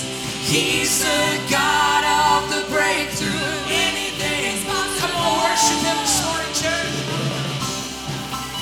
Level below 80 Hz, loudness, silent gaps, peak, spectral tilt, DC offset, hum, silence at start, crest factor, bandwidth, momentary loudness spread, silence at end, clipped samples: -44 dBFS; -19 LUFS; none; -4 dBFS; -2.5 dB/octave; under 0.1%; none; 0 s; 16 dB; over 20 kHz; 8 LU; 0 s; under 0.1%